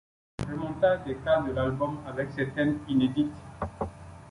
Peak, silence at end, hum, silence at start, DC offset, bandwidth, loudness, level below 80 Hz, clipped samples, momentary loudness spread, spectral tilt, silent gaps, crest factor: -12 dBFS; 0 s; none; 0.4 s; under 0.1%; 11.5 kHz; -29 LUFS; -50 dBFS; under 0.1%; 12 LU; -7.5 dB/octave; none; 18 dB